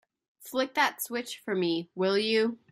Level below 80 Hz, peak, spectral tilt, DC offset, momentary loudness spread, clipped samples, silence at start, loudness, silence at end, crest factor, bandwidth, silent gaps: -80 dBFS; -12 dBFS; -4 dB/octave; under 0.1%; 9 LU; under 0.1%; 0.4 s; -29 LUFS; 0.15 s; 18 dB; 16 kHz; none